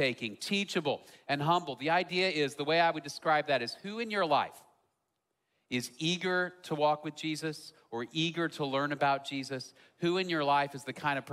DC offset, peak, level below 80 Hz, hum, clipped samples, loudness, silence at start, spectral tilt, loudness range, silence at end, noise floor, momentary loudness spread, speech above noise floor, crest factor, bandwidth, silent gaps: under 0.1%; -14 dBFS; -78 dBFS; none; under 0.1%; -32 LUFS; 0 s; -4.5 dB/octave; 4 LU; 0 s; -83 dBFS; 9 LU; 51 dB; 18 dB; 15.5 kHz; none